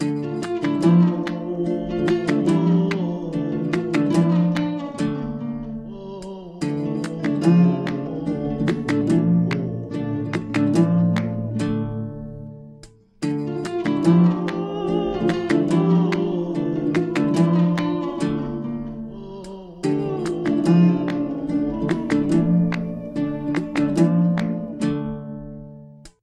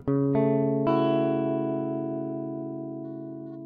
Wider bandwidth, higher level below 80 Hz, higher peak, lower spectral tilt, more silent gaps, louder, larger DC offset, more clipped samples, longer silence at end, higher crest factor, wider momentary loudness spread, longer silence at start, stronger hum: first, 10 kHz vs 4.9 kHz; first, -48 dBFS vs -62 dBFS; first, -4 dBFS vs -10 dBFS; second, -8 dB/octave vs -11 dB/octave; neither; first, -21 LUFS vs -27 LUFS; neither; neither; first, 0.15 s vs 0 s; about the same, 16 dB vs 16 dB; about the same, 14 LU vs 13 LU; about the same, 0 s vs 0 s; neither